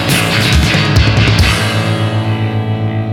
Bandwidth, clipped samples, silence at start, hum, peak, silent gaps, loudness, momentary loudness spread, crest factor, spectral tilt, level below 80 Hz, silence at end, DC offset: 17 kHz; under 0.1%; 0 s; none; 0 dBFS; none; -12 LUFS; 6 LU; 12 dB; -5 dB/octave; -22 dBFS; 0 s; under 0.1%